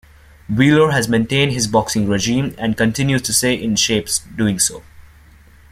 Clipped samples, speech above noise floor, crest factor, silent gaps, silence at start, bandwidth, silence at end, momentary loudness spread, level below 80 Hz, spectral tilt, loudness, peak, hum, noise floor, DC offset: under 0.1%; 29 dB; 18 dB; none; 0.5 s; 16 kHz; 0.7 s; 5 LU; -44 dBFS; -4 dB/octave; -16 LUFS; 0 dBFS; none; -45 dBFS; under 0.1%